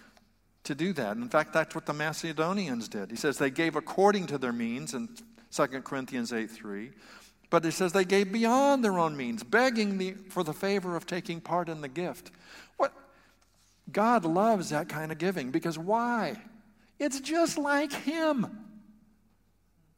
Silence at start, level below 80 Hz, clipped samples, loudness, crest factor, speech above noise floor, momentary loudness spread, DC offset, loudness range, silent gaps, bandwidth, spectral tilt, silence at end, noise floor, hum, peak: 0.65 s; -70 dBFS; under 0.1%; -30 LUFS; 20 dB; 39 dB; 12 LU; under 0.1%; 6 LU; none; 16.5 kHz; -5 dB/octave; 1.2 s; -69 dBFS; none; -10 dBFS